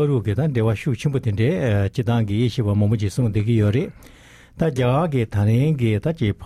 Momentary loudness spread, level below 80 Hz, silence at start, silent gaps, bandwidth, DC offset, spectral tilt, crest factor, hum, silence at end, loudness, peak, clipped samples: 4 LU; -44 dBFS; 0 s; none; 12.5 kHz; under 0.1%; -8 dB/octave; 12 dB; none; 0 s; -20 LUFS; -8 dBFS; under 0.1%